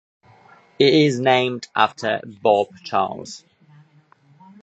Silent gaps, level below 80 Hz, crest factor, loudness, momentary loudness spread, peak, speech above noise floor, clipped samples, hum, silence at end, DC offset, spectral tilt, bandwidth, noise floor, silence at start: none; -66 dBFS; 20 dB; -19 LUFS; 12 LU; 0 dBFS; 36 dB; under 0.1%; none; 1.25 s; under 0.1%; -5 dB/octave; 8.4 kHz; -55 dBFS; 0.8 s